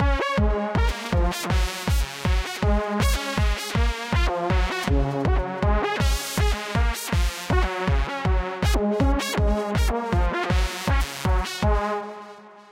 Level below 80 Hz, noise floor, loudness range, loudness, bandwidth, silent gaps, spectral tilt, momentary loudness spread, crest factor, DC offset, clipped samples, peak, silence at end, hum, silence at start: -26 dBFS; -44 dBFS; 1 LU; -24 LUFS; 16 kHz; none; -5 dB/octave; 2 LU; 14 dB; under 0.1%; under 0.1%; -8 dBFS; 0.1 s; none; 0 s